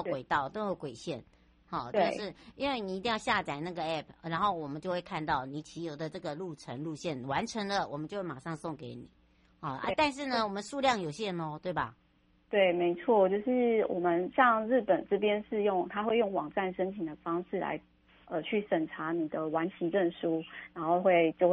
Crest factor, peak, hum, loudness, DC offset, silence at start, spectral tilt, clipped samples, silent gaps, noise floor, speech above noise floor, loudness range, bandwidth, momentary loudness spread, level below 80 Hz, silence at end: 22 dB; -10 dBFS; none; -32 LUFS; under 0.1%; 0 s; -5.5 dB/octave; under 0.1%; none; -68 dBFS; 36 dB; 8 LU; 11 kHz; 13 LU; -64 dBFS; 0 s